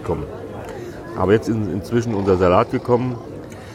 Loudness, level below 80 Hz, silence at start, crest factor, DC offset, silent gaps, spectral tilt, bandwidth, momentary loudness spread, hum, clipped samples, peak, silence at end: -19 LUFS; -44 dBFS; 0 s; 18 dB; under 0.1%; none; -7.5 dB/octave; 15.5 kHz; 16 LU; none; under 0.1%; -2 dBFS; 0 s